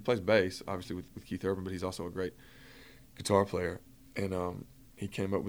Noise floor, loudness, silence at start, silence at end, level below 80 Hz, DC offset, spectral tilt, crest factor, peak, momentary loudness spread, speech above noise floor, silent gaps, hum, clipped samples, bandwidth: -56 dBFS; -34 LUFS; 0 s; 0 s; -60 dBFS; under 0.1%; -5.5 dB/octave; 22 dB; -12 dBFS; 25 LU; 22 dB; none; none; under 0.1%; over 20 kHz